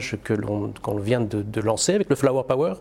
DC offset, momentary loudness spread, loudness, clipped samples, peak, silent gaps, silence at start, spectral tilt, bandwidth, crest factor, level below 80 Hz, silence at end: under 0.1%; 7 LU; -23 LUFS; under 0.1%; -6 dBFS; none; 0 s; -5 dB/octave; 16.5 kHz; 16 dB; -52 dBFS; 0 s